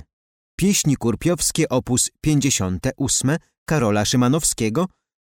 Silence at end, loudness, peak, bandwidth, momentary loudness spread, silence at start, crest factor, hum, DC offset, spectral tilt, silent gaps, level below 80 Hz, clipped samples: 0.4 s; -20 LUFS; -6 dBFS; 17.5 kHz; 6 LU; 0.6 s; 14 dB; none; under 0.1%; -4.5 dB/octave; 3.58-3.66 s; -42 dBFS; under 0.1%